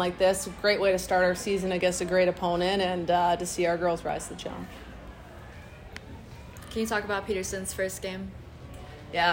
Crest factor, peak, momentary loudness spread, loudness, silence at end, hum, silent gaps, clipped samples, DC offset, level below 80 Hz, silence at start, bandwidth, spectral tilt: 16 dB; -12 dBFS; 20 LU; -27 LUFS; 0 s; none; none; under 0.1%; under 0.1%; -50 dBFS; 0 s; 16.5 kHz; -4 dB/octave